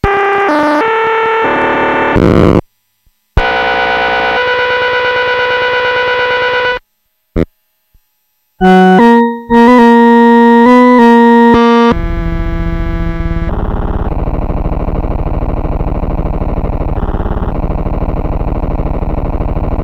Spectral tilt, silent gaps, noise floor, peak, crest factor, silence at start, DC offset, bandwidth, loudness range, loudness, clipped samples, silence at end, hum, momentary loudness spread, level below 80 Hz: -7.5 dB/octave; none; -63 dBFS; 0 dBFS; 10 dB; 0.05 s; under 0.1%; 8 kHz; 11 LU; -10 LUFS; 1%; 0 s; none; 12 LU; -18 dBFS